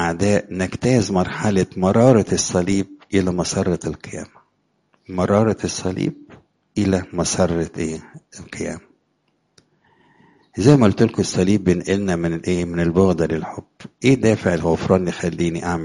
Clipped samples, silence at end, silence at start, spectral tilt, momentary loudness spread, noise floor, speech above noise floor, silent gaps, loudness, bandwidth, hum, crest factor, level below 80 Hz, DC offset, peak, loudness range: under 0.1%; 0 s; 0 s; -6 dB/octave; 14 LU; -67 dBFS; 48 dB; none; -19 LUFS; 11.5 kHz; none; 20 dB; -46 dBFS; under 0.1%; 0 dBFS; 6 LU